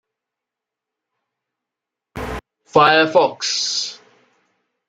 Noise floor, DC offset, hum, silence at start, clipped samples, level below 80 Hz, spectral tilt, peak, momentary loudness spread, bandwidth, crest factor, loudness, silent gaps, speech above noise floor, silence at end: -85 dBFS; under 0.1%; none; 2.15 s; under 0.1%; -48 dBFS; -2.5 dB/octave; -2 dBFS; 19 LU; 14.5 kHz; 20 dB; -16 LUFS; none; 69 dB; 0.95 s